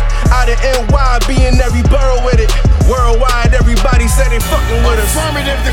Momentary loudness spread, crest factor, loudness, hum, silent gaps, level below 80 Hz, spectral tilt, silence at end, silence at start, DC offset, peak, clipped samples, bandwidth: 3 LU; 8 dB; -12 LUFS; none; none; -10 dBFS; -5 dB/octave; 0 s; 0 s; under 0.1%; 0 dBFS; under 0.1%; 17 kHz